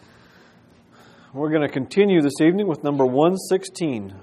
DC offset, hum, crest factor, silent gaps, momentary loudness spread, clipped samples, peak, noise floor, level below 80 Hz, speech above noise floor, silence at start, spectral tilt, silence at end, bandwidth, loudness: under 0.1%; none; 18 dB; none; 9 LU; under 0.1%; -4 dBFS; -52 dBFS; -68 dBFS; 33 dB; 1.35 s; -6.5 dB/octave; 0 s; 14 kHz; -20 LUFS